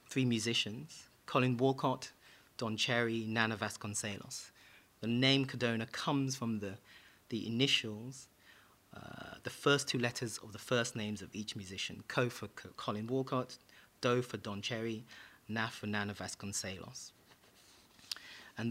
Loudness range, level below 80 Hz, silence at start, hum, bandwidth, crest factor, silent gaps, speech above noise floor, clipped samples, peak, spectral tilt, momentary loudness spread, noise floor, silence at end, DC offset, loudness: 5 LU; -74 dBFS; 0.1 s; none; 16 kHz; 24 dB; none; 27 dB; under 0.1%; -12 dBFS; -4 dB/octave; 18 LU; -64 dBFS; 0 s; under 0.1%; -36 LUFS